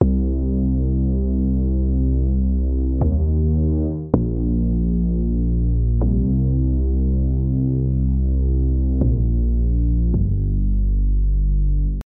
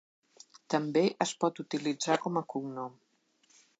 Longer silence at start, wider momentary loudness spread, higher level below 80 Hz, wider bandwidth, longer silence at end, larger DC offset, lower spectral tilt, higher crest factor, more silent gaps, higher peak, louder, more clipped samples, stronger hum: second, 0 s vs 0.7 s; second, 2 LU vs 11 LU; first, -20 dBFS vs -86 dBFS; second, 1.4 kHz vs 9.2 kHz; second, 0.05 s vs 0.85 s; neither; first, -15 dB/octave vs -4.5 dB/octave; about the same, 18 dB vs 22 dB; neither; first, 0 dBFS vs -12 dBFS; first, -20 LUFS vs -32 LUFS; neither; neither